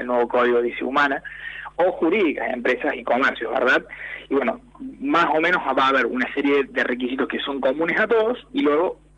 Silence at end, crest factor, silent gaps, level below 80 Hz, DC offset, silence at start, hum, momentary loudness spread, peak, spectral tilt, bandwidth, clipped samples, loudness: 0.25 s; 14 dB; none; -54 dBFS; under 0.1%; 0 s; none; 9 LU; -8 dBFS; -5.5 dB/octave; 9.8 kHz; under 0.1%; -21 LUFS